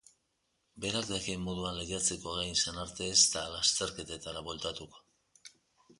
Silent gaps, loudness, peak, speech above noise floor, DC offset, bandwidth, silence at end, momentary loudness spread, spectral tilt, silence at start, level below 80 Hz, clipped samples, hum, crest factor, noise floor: none; -32 LUFS; -10 dBFS; 45 dB; under 0.1%; 11.5 kHz; 0.5 s; 15 LU; -1.5 dB/octave; 0.75 s; -56 dBFS; under 0.1%; none; 24 dB; -79 dBFS